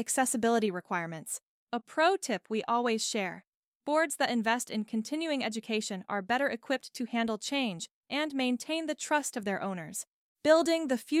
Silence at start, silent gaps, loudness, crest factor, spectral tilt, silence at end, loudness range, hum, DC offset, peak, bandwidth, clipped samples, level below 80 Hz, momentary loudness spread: 0 s; 1.45-1.67 s, 3.47-3.80 s, 7.91-8.03 s, 10.10-10.35 s; -31 LUFS; 20 dB; -3 dB/octave; 0 s; 2 LU; none; under 0.1%; -12 dBFS; 16 kHz; under 0.1%; -78 dBFS; 11 LU